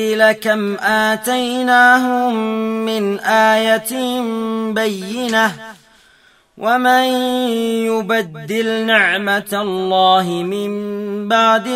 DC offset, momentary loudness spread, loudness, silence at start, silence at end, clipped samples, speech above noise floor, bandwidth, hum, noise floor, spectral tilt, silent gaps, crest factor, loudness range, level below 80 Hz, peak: under 0.1%; 8 LU; -15 LUFS; 0 s; 0 s; under 0.1%; 36 dB; 16 kHz; none; -52 dBFS; -4 dB/octave; none; 16 dB; 3 LU; -62 dBFS; 0 dBFS